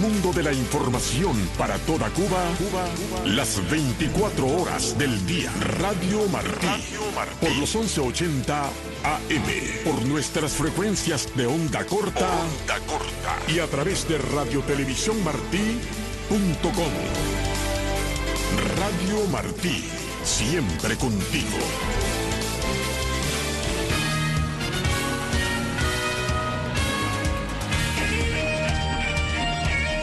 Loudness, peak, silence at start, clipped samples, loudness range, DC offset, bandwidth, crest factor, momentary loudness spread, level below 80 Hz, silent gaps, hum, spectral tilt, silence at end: -24 LUFS; -8 dBFS; 0 s; under 0.1%; 1 LU; under 0.1%; 12.5 kHz; 16 dB; 3 LU; -34 dBFS; none; none; -4 dB/octave; 0 s